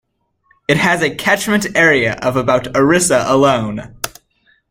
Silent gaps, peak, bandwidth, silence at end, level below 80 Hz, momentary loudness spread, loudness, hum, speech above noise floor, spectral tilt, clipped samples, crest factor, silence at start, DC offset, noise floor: none; 0 dBFS; 16.5 kHz; 0.6 s; -46 dBFS; 13 LU; -14 LUFS; none; 45 dB; -4 dB/octave; under 0.1%; 16 dB; 0.7 s; under 0.1%; -59 dBFS